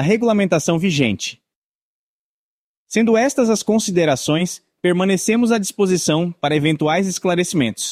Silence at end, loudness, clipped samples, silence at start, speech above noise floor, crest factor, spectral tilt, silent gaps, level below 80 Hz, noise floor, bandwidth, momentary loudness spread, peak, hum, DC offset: 0 s; -18 LUFS; under 0.1%; 0 s; over 73 dB; 16 dB; -5 dB/octave; 1.55-2.86 s; -56 dBFS; under -90 dBFS; 15.5 kHz; 4 LU; -2 dBFS; none; under 0.1%